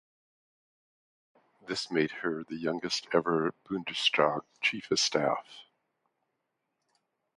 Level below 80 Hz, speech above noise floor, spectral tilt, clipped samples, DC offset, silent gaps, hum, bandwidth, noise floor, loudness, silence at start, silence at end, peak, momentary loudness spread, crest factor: -72 dBFS; 52 dB; -3 dB/octave; under 0.1%; under 0.1%; none; none; 11.5 kHz; -82 dBFS; -30 LUFS; 1.65 s; 1.75 s; -10 dBFS; 9 LU; 24 dB